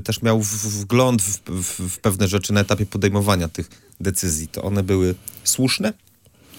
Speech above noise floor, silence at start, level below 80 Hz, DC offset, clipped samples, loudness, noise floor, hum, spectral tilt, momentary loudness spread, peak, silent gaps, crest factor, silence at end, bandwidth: 30 dB; 0 s; -44 dBFS; under 0.1%; under 0.1%; -20 LUFS; -50 dBFS; none; -4.5 dB/octave; 7 LU; -4 dBFS; none; 18 dB; 0.65 s; 17 kHz